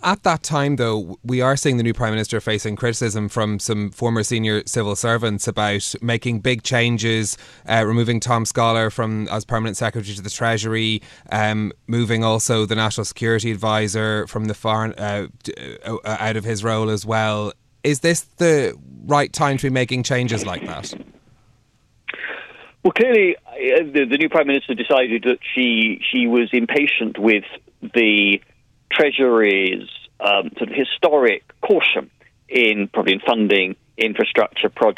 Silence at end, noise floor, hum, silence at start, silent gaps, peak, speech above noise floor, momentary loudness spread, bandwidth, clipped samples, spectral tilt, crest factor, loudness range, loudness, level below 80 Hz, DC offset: 0.05 s; -59 dBFS; none; 0 s; none; -2 dBFS; 40 dB; 10 LU; 14 kHz; under 0.1%; -4.5 dB/octave; 16 dB; 5 LU; -19 LUFS; -52 dBFS; under 0.1%